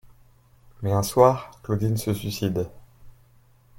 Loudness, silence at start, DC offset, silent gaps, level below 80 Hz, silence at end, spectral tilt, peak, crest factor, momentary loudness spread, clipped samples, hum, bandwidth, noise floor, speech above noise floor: -24 LUFS; 0.8 s; under 0.1%; none; -52 dBFS; 0.7 s; -6.5 dB/octave; -2 dBFS; 22 dB; 13 LU; under 0.1%; none; 17 kHz; -56 dBFS; 34 dB